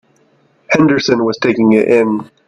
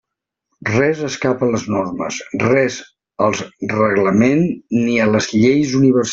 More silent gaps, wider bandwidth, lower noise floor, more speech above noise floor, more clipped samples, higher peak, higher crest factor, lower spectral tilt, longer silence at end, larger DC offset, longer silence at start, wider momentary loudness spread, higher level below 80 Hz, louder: neither; first, 11 kHz vs 7.8 kHz; second, -54 dBFS vs -77 dBFS; second, 42 dB vs 61 dB; neither; about the same, 0 dBFS vs -2 dBFS; about the same, 14 dB vs 16 dB; about the same, -6 dB/octave vs -5.5 dB/octave; first, 0.25 s vs 0 s; neither; about the same, 0.7 s vs 0.6 s; second, 5 LU vs 9 LU; about the same, -54 dBFS vs -52 dBFS; first, -12 LUFS vs -17 LUFS